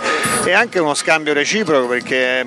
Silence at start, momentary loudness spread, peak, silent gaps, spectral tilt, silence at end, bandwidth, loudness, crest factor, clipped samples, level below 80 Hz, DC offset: 0 s; 3 LU; -2 dBFS; none; -2.5 dB/octave; 0 s; 13.5 kHz; -15 LUFS; 14 dB; under 0.1%; -58 dBFS; under 0.1%